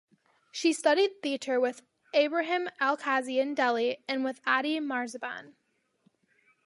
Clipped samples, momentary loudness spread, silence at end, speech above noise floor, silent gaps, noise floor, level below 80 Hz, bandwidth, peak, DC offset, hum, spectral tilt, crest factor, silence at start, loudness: under 0.1%; 10 LU; 1.2 s; 42 dB; none; -70 dBFS; -86 dBFS; 11.5 kHz; -12 dBFS; under 0.1%; none; -2 dB/octave; 18 dB; 0.55 s; -29 LUFS